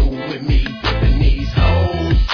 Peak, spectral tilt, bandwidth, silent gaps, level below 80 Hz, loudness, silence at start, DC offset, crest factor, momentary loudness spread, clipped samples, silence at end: -4 dBFS; -7.5 dB/octave; 5.4 kHz; none; -16 dBFS; -17 LUFS; 0 s; under 0.1%; 12 dB; 5 LU; under 0.1%; 0 s